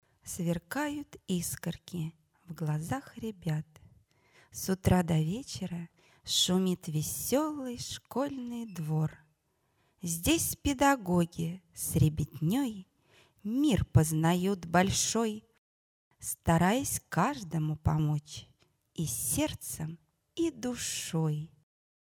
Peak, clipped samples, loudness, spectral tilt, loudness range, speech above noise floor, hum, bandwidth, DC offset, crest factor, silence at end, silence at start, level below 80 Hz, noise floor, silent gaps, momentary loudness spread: -12 dBFS; under 0.1%; -31 LUFS; -5 dB/octave; 6 LU; 44 dB; none; 19 kHz; under 0.1%; 20 dB; 0.7 s; 0.25 s; -52 dBFS; -75 dBFS; 15.58-16.11 s; 15 LU